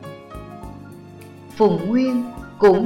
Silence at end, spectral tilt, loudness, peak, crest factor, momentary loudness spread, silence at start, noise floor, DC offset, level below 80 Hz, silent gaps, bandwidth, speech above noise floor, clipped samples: 0 s; -8 dB/octave; -19 LUFS; -6 dBFS; 16 dB; 23 LU; 0 s; -40 dBFS; under 0.1%; -48 dBFS; none; 13.5 kHz; 24 dB; under 0.1%